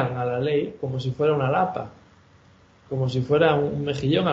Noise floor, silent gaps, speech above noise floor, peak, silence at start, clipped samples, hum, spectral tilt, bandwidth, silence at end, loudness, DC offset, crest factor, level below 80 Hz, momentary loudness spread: -54 dBFS; none; 32 dB; -4 dBFS; 0 s; under 0.1%; none; -7.5 dB/octave; 7.6 kHz; 0 s; -24 LUFS; under 0.1%; 18 dB; -56 dBFS; 9 LU